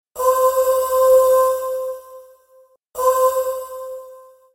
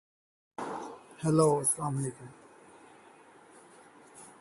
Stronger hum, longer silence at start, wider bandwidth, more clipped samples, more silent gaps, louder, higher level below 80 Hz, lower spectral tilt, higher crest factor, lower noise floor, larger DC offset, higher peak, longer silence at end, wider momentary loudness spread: neither; second, 0.15 s vs 0.6 s; first, 16.5 kHz vs 12 kHz; neither; neither; first, -17 LUFS vs -30 LUFS; first, -56 dBFS vs -70 dBFS; second, -1 dB/octave vs -5.5 dB/octave; second, 14 dB vs 22 dB; about the same, -53 dBFS vs -56 dBFS; neither; first, -4 dBFS vs -12 dBFS; first, 0.35 s vs 0.1 s; second, 20 LU vs 26 LU